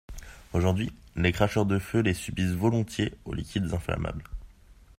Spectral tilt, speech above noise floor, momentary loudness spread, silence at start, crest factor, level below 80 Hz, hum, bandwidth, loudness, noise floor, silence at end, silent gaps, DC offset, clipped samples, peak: -6.5 dB/octave; 26 dB; 14 LU; 0.1 s; 22 dB; -44 dBFS; none; 16 kHz; -28 LUFS; -54 dBFS; 0.25 s; none; under 0.1%; under 0.1%; -6 dBFS